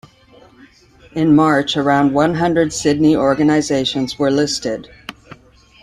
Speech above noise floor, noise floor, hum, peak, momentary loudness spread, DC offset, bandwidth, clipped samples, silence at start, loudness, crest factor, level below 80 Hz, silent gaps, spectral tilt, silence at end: 32 dB; -47 dBFS; none; -2 dBFS; 14 LU; under 0.1%; 11.5 kHz; under 0.1%; 1.15 s; -15 LUFS; 14 dB; -48 dBFS; none; -5 dB/octave; 0.7 s